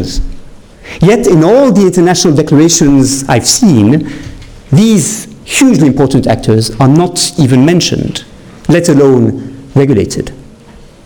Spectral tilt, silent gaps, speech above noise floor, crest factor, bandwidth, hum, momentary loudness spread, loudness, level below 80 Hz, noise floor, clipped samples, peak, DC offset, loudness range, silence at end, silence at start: -5 dB/octave; none; 28 dB; 8 dB; 19.5 kHz; none; 14 LU; -8 LUFS; -28 dBFS; -35 dBFS; under 0.1%; 0 dBFS; under 0.1%; 3 LU; 0.6 s; 0 s